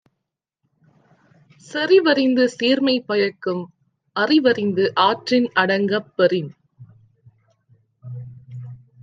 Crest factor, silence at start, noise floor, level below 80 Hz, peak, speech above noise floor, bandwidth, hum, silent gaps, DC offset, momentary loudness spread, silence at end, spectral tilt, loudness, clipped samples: 18 dB; 1.7 s; -80 dBFS; -70 dBFS; -2 dBFS; 62 dB; 9.2 kHz; none; none; under 0.1%; 21 LU; 0.25 s; -5.5 dB/octave; -19 LUFS; under 0.1%